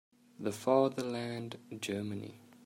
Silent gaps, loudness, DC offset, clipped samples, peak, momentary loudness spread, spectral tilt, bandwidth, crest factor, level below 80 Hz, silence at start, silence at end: none; -35 LUFS; under 0.1%; under 0.1%; -14 dBFS; 15 LU; -5.5 dB/octave; 16 kHz; 22 dB; -78 dBFS; 0.4 s; 0.25 s